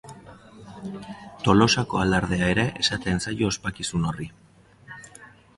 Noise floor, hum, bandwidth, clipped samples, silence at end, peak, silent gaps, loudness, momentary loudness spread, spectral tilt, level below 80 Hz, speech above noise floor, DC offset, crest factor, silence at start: -49 dBFS; none; 11.5 kHz; under 0.1%; 0.3 s; -4 dBFS; none; -23 LUFS; 23 LU; -4.5 dB/octave; -44 dBFS; 26 dB; under 0.1%; 22 dB; 0.05 s